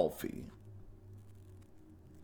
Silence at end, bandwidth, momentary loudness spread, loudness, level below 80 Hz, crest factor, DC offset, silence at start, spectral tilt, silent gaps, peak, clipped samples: 0 s; 19.5 kHz; 16 LU; -45 LUFS; -62 dBFS; 26 dB; under 0.1%; 0 s; -6 dB/octave; none; -16 dBFS; under 0.1%